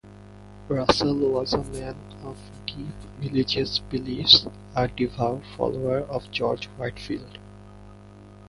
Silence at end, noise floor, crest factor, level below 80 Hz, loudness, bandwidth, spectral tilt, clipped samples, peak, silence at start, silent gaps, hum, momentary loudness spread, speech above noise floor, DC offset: 0 s; -46 dBFS; 26 dB; -46 dBFS; -24 LUFS; 11.5 kHz; -5 dB/octave; under 0.1%; 0 dBFS; 0.05 s; none; 50 Hz at -50 dBFS; 19 LU; 21 dB; under 0.1%